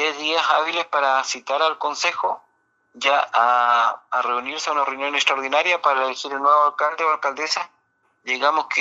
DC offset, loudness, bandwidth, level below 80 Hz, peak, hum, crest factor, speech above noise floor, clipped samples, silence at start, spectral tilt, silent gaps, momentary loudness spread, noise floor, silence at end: under 0.1%; -20 LUFS; 8.2 kHz; -80 dBFS; -4 dBFS; none; 18 dB; 45 dB; under 0.1%; 0 s; 0.5 dB/octave; none; 7 LU; -66 dBFS; 0 s